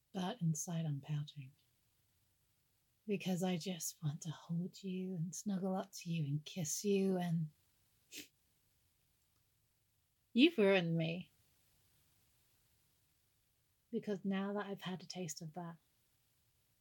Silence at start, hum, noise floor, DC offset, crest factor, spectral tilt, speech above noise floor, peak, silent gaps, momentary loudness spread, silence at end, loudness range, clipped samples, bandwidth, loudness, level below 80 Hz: 0.15 s; none; -79 dBFS; under 0.1%; 24 dB; -5 dB/octave; 41 dB; -16 dBFS; none; 18 LU; 1.05 s; 9 LU; under 0.1%; 17.5 kHz; -39 LUFS; -88 dBFS